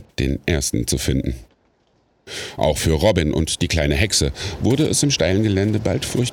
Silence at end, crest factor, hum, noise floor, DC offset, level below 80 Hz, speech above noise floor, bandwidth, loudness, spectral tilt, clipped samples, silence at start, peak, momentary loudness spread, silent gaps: 0 s; 18 dB; none; -62 dBFS; under 0.1%; -32 dBFS; 43 dB; 18.5 kHz; -19 LUFS; -4.5 dB/octave; under 0.1%; 0 s; -2 dBFS; 7 LU; none